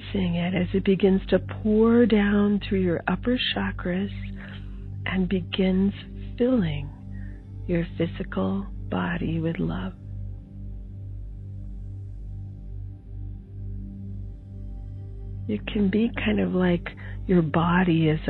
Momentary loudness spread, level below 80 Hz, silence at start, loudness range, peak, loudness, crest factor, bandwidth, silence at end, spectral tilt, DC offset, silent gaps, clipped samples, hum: 18 LU; -40 dBFS; 0 s; 16 LU; -6 dBFS; -24 LUFS; 18 dB; 4.5 kHz; 0 s; -10 dB/octave; under 0.1%; none; under 0.1%; 50 Hz at -40 dBFS